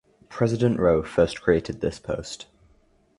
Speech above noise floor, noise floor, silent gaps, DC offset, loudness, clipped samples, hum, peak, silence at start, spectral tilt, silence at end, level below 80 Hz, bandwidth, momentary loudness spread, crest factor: 38 dB; -61 dBFS; none; under 0.1%; -24 LUFS; under 0.1%; none; -6 dBFS; 0.3 s; -6.5 dB/octave; 0.75 s; -46 dBFS; 11.5 kHz; 14 LU; 20 dB